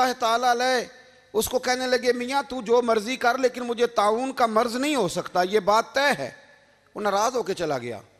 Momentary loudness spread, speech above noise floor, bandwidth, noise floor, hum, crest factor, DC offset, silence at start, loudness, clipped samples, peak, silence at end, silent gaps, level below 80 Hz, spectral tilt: 7 LU; 33 dB; 14.5 kHz; -56 dBFS; none; 18 dB; under 0.1%; 0 s; -24 LUFS; under 0.1%; -6 dBFS; 0.2 s; none; -58 dBFS; -3 dB/octave